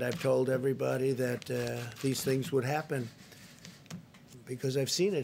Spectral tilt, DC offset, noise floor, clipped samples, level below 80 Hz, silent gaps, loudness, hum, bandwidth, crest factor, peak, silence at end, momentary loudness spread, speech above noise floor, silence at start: -5 dB/octave; under 0.1%; -53 dBFS; under 0.1%; -70 dBFS; none; -32 LUFS; none; 16 kHz; 16 dB; -16 dBFS; 0 s; 21 LU; 22 dB; 0 s